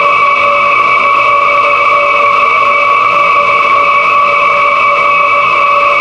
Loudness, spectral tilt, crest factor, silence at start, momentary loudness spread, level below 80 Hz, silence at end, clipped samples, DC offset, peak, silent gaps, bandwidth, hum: -7 LUFS; -3 dB/octave; 8 dB; 0 s; 0 LU; -46 dBFS; 0 s; under 0.1%; under 0.1%; 0 dBFS; none; 9.6 kHz; none